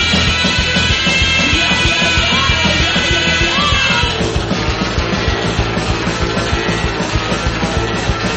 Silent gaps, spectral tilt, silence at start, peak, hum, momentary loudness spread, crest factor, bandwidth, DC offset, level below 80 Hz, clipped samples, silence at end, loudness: none; -3.5 dB/octave; 0 s; 0 dBFS; none; 6 LU; 14 dB; 8.6 kHz; under 0.1%; -24 dBFS; under 0.1%; 0 s; -13 LUFS